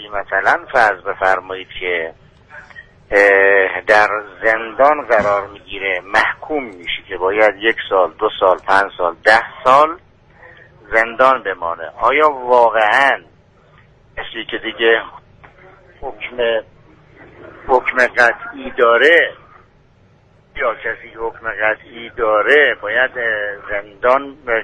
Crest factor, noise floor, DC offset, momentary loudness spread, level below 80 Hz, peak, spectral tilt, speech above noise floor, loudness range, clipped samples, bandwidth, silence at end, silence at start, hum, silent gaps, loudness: 16 dB; -51 dBFS; under 0.1%; 14 LU; -48 dBFS; 0 dBFS; -3.5 dB/octave; 35 dB; 7 LU; under 0.1%; 10.5 kHz; 0 s; 0 s; none; none; -15 LUFS